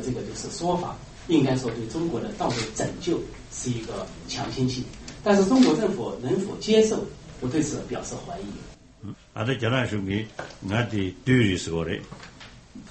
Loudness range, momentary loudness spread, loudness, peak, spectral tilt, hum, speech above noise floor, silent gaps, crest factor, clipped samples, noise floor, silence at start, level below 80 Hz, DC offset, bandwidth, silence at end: 6 LU; 18 LU; -26 LUFS; -8 dBFS; -5.5 dB/octave; none; 20 dB; none; 18 dB; under 0.1%; -45 dBFS; 0 s; -48 dBFS; under 0.1%; 8.8 kHz; 0 s